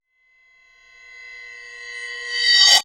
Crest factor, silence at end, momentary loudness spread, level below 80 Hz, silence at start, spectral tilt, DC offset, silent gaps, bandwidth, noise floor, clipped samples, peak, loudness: 22 dB; 0 s; 26 LU; -68 dBFS; 1.2 s; 4.5 dB/octave; under 0.1%; none; over 20 kHz; -60 dBFS; under 0.1%; 0 dBFS; -15 LUFS